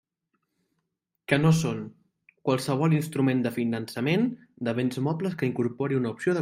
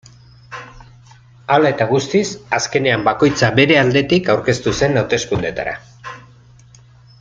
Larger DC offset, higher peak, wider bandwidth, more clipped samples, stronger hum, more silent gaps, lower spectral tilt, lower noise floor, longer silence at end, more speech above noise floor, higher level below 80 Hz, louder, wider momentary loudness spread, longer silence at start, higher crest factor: neither; second, -6 dBFS vs 0 dBFS; first, 16 kHz vs 9.2 kHz; neither; neither; neither; first, -6.5 dB/octave vs -5 dB/octave; first, -80 dBFS vs -45 dBFS; second, 0 s vs 1 s; first, 55 dB vs 30 dB; second, -64 dBFS vs -46 dBFS; second, -27 LUFS vs -16 LUFS; second, 8 LU vs 21 LU; first, 1.3 s vs 0.5 s; about the same, 22 dB vs 18 dB